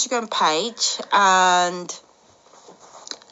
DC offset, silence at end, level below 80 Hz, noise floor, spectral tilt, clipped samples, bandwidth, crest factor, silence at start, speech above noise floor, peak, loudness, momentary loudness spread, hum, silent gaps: under 0.1%; 0.15 s; -80 dBFS; -53 dBFS; -1 dB/octave; under 0.1%; 8.2 kHz; 16 dB; 0 s; 34 dB; -6 dBFS; -18 LUFS; 21 LU; none; none